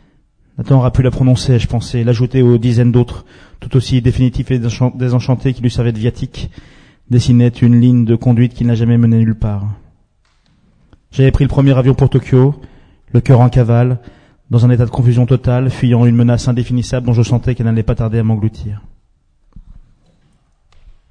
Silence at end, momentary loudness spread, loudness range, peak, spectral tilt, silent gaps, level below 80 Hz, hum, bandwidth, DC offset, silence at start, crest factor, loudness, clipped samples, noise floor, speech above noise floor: 1.3 s; 11 LU; 4 LU; 0 dBFS; -8.5 dB/octave; none; -30 dBFS; none; 9.8 kHz; under 0.1%; 0.6 s; 12 dB; -13 LUFS; 0.1%; -55 dBFS; 43 dB